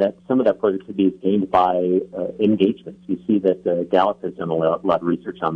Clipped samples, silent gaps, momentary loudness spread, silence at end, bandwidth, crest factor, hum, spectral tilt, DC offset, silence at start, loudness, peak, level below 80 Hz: under 0.1%; none; 7 LU; 0 s; 6 kHz; 16 dB; none; -9 dB/octave; under 0.1%; 0 s; -20 LUFS; -4 dBFS; -60 dBFS